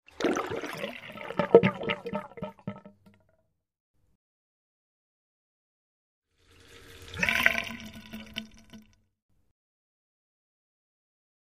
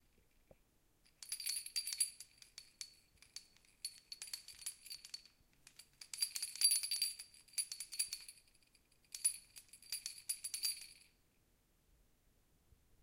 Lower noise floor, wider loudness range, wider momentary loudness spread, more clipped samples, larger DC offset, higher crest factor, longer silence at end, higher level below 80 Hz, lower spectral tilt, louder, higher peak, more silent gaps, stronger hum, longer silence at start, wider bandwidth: about the same, -73 dBFS vs -76 dBFS; first, 19 LU vs 12 LU; about the same, 22 LU vs 21 LU; neither; neither; about the same, 32 dB vs 28 dB; first, 2.6 s vs 2.05 s; first, -62 dBFS vs -78 dBFS; first, -5 dB/octave vs 3.5 dB/octave; first, -28 LUFS vs -40 LUFS; first, -2 dBFS vs -18 dBFS; first, 3.80-3.94 s, 4.15-6.22 s vs none; neither; second, 0.2 s vs 1.2 s; about the same, 15.5 kHz vs 17 kHz